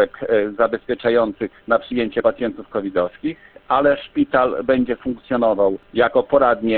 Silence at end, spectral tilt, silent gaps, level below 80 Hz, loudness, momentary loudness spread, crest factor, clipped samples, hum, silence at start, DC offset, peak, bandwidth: 0 s; -10 dB/octave; none; -50 dBFS; -19 LUFS; 9 LU; 16 dB; under 0.1%; none; 0 s; under 0.1%; -2 dBFS; 4.4 kHz